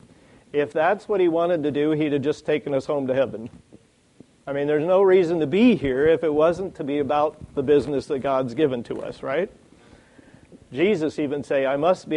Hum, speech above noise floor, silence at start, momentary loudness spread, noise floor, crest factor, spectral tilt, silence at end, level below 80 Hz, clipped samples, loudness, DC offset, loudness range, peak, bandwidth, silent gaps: none; 32 dB; 0.55 s; 10 LU; -53 dBFS; 16 dB; -7 dB/octave; 0 s; -56 dBFS; under 0.1%; -22 LUFS; under 0.1%; 6 LU; -6 dBFS; 10.5 kHz; none